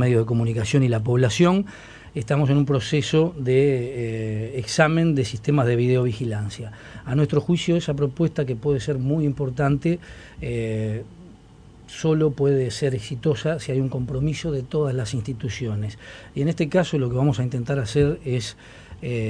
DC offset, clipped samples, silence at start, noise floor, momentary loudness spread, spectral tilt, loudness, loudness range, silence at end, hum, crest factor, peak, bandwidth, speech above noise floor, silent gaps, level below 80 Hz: under 0.1%; under 0.1%; 0 s; -47 dBFS; 12 LU; -6.5 dB/octave; -23 LUFS; 4 LU; 0 s; none; 20 dB; -2 dBFS; 10.5 kHz; 25 dB; none; -46 dBFS